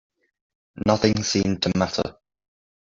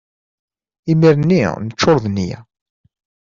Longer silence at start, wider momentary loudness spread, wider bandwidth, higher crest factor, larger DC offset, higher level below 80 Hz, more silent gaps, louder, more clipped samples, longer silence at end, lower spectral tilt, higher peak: about the same, 0.75 s vs 0.85 s; second, 7 LU vs 14 LU; about the same, 7.6 kHz vs 7.4 kHz; first, 22 dB vs 16 dB; neither; about the same, -50 dBFS vs -50 dBFS; neither; second, -23 LUFS vs -15 LUFS; neither; second, 0.75 s vs 0.95 s; second, -5 dB/octave vs -6.5 dB/octave; about the same, -4 dBFS vs -2 dBFS